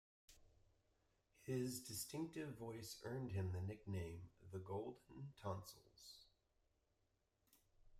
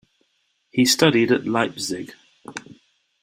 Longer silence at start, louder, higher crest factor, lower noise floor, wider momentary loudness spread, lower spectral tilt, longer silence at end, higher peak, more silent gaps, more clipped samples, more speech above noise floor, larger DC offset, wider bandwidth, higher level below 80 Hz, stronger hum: second, 0.3 s vs 0.75 s; second, -50 LUFS vs -19 LUFS; about the same, 18 dB vs 22 dB; first, -85 dBFS vs -69 dBFS; second, 15 LU vs 21 LU; first, -5.5 dB/octave vs -4 dB/octave; second, 0 s vs 0.65 s; second, -34 dBFS vs -2 dBFS; neither; neither; second, 36 dB vs 50 dB; neither; about the same, 16 kHz vs 16 kHz; second, -76 dBFS vs -62 dBFS; neither